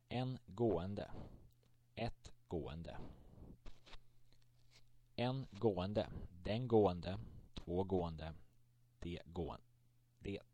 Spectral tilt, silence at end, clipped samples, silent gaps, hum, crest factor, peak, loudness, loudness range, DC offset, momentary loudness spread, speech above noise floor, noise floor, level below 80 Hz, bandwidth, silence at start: -8 dB/octave; 0.1 s; under 0.1%; none; none; 22 dB; -22 dBFS; -42 LUFS; 12 LU; under 0.1%; 23 LU; 31 dB; -72 dBFS; -60 dBFS; 10 kHz; 0.1 s